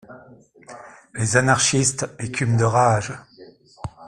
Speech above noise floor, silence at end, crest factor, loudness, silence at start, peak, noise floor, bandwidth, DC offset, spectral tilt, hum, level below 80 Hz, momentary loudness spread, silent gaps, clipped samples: 29 dB; 0 s; 22 dB; -19 LUFS; 0.1 s; 0 dBFS; -48 dBFS; 12.5 kHz; under 0.1%; -4 dB/octave; none; -52 dBFS; 22 LU; none; under 0.1%